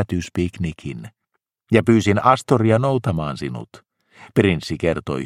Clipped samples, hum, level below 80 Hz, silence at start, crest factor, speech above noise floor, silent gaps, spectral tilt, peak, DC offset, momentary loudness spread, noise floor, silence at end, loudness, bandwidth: under 0.1%; none; -46 dBFS; 0 s; 20 dB; 56 dB; none; -7 dB/octave; 0 dBFS; under 0.1%; 14 LU; -75 dBFS; 0 s; -19 LUFS; 14 kHz